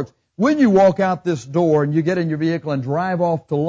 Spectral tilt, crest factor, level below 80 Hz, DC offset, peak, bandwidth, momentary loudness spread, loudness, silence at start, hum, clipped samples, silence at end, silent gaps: -8 dB/octave; 12 dB; -56 dBFS; under 0.1%; -6 dBFS; 7.8 kHz; 8 LU; -18 LUFS; 0 s; none; under 0.1%; 0 s; none